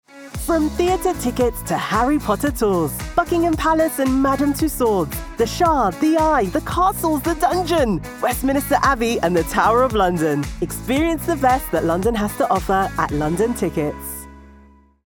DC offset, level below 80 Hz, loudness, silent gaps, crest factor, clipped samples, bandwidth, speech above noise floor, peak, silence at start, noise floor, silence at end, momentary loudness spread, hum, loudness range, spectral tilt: under 0.1%; -34 dBFS; -19 LUFS; none; 16 dB; under 0.1%; over 20 kHz; 30 dB; -2 dBFS; 0.15 s; -49 dBFS; 0.6 s; 6 LU; none; 2 LU; -5.5 dB/octave